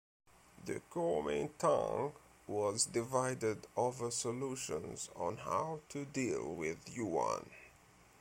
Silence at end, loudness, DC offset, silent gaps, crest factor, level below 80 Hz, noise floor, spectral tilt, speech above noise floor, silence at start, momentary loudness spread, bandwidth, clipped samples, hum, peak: 0.5 s; -38 LUFS; under 0.1%; none; 20 dB; -68 dBFS; -64 dBFS; -4 dB/octave; 26 dB; 0.55 s; 10 LU; 16.5 kHz; under 0.1%; none; -20 dBFS